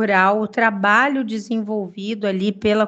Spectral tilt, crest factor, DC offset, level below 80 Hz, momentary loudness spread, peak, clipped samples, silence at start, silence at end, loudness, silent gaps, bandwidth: -6 dB/octave; 18 dB; under 0.1%; -58 dBFS; 10 LU; 0 dBFS; under 0.1%; 0 s; 0 s; -19 LUFS; none; 8.2 kHz